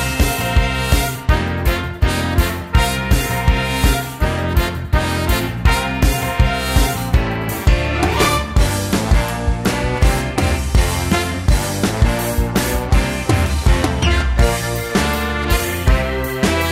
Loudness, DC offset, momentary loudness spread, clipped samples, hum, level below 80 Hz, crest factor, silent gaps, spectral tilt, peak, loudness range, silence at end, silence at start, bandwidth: -17 LUFS; under 0.1%; 3 LU; under 0.1%; none; -20 dBFS; 16 dB; none; -5 dB/octave; 0 dBFS; 1 LU; 0 s; 0 s; 16.5 kHz